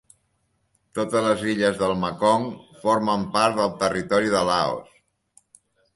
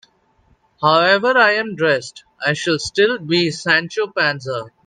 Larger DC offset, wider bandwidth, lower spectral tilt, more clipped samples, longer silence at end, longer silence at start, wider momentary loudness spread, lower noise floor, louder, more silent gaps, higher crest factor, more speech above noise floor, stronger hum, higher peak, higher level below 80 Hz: neither; first, 11.5 kHz vs 9.6 kHz; about the same, -5 dB/octave vs -4 dB/octave; neither; first, 1.1 s vs 0.2 s; first, 0.95 s vs 0.8 s; about the same, 8 LU vs 9 LU; first, -70 dBFS vs -58 dBFS; second, -22 LUFS vs -17 LUFS; neither; about the same, 20 dB vs 18 dB; first, 48 dB vs 41 dB; neither; second, -4 dBFS vs 0 dBFS; about the same, -56 dBFS vs -60 dBFS